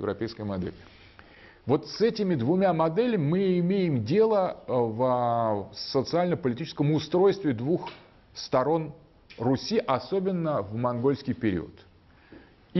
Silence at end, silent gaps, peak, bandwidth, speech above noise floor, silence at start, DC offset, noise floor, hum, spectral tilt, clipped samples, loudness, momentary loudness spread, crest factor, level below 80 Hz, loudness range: 0 s; none; -12 dBFS; 6.2 kHz; 27 dB; 0 s; under 0.1%; -53 dBFS; none; -7.5 dB/octave; under 0.1%; -27 LUFS; 9 LU; 16 dB; -60 dBFS; 4 LU